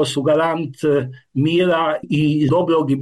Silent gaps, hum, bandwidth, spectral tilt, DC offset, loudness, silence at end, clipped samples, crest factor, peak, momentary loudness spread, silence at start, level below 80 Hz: none; none; 12.5 kHz; -6.5 dB/octave; under 0.1%; -18 LUFS; 0 s; under 0.1%; 10 dB; -8 dBFS; 5 LU; 0 s; -56 dBFS